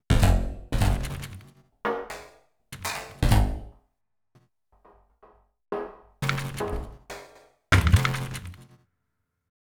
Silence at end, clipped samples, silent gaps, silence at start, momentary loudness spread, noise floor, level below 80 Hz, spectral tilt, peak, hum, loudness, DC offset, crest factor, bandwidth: 1.1 s; under 0.1%; none; 0.1 s; 19 LU; -79 dBFS; -32 dBFS; -5.5 dB/octave; -6 dBFS; none; -27 LUFS; under 0.1%; 22 dB; over 20 kHz